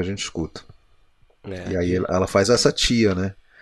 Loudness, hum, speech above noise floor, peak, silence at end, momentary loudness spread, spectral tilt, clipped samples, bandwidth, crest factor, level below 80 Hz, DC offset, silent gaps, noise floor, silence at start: -21 LUFS; none; 35 dB; -2 dBFS; 0.3 s; 16 LU; -4.5 dB/octave; under 0.1%; 12 kHz; 20 dB; -42 dBFS; under 0.1%; none; -56 dBFS; 0 s